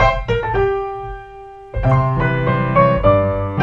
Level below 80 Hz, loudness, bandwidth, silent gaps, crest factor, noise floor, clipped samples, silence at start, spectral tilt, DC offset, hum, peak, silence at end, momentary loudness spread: -28 dBFS; -16 LUFS; 7 kHz; none; 16 dB; -36 dBFS; under 0.1%; 0 s; -8.5 dB/octave; under 0.1%; none; 0 dBFS; 0 s; 17 LU